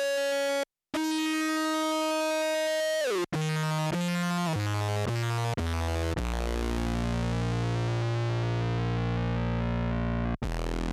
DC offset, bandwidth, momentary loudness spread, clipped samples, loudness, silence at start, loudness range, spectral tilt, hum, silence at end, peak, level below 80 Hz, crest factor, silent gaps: under 0.1%; 15 kHz; 3 LU; under 0.1%; -29 LUFS; 0 s; 2 LU; -5.5 dB/octave; none; 0 s; -20 dBFS; -38 dBFS; 8 dB; none